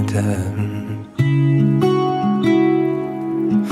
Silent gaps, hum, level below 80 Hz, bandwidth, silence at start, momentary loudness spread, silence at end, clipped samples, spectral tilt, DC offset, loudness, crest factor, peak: none; none; -52 dBFS; 12 kHz; 0 s; 8 LU; 0 s; under 0.1%; -8 dB/octave; under 0.1%; -18 LUFS; 12 dB; -4 dBFS